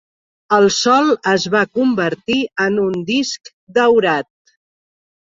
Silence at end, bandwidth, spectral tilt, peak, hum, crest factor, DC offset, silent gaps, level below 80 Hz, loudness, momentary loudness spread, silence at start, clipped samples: 1.1 s; 8 kHz; -4 dB/octave; -2 dBFS; none; 16 dB; under 0.1%; 3.53-3.67 s; -58 dBFS; -16 LUFS; 8 LU; 0.5 s; under 0.1%